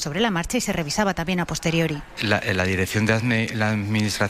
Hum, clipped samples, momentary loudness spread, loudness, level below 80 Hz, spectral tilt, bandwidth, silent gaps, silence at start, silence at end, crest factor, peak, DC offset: none; under 0.1%; 3 LU; -23 LUFS; -44 dBFS; -4.5 dB/octave; 16 kHz; none; 0 s; 0 s; 18 dB; -6 dBFS; under 0.1%